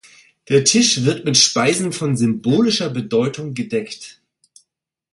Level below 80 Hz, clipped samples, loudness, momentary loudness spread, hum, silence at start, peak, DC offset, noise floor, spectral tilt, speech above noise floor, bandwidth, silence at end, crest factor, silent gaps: -60 dBFS; under 0.1%; -17 LUFS; 11 LU; none; 0.5 s; 0 dBFS; under 0.1%; -73 dBFS; -3.5 dB/octave; 56 dB; 11.5 kHz; 1 s; 18 dB; none